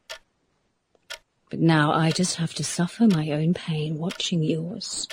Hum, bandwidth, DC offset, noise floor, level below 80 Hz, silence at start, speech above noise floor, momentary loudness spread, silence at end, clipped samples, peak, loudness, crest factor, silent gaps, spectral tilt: none; 15.5 kHz; under 0.1%; -71 dBFS; -62 dBFS; 0.1 s; 48 dB; 20 LU; 0 s; under 0.1%; -6 dBFS; -24 LUFS; 20 dB; none; -5 dB/octave